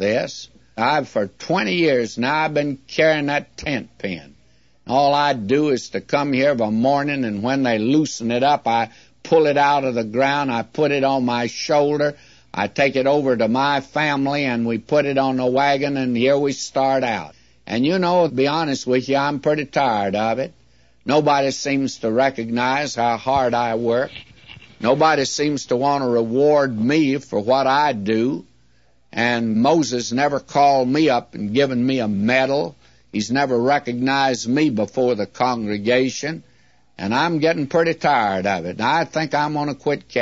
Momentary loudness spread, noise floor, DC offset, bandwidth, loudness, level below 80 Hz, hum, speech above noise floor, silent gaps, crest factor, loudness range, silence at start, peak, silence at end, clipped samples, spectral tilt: 7 LU; -60 dBFS; 0.2%; 8 kHz; -19 LUFS; -58 dBFS; none; 41 dB; none; 16 dB; 2 LU; 0 s; -4 dBFS; 0 s; under 0.1%; -5 dB/octave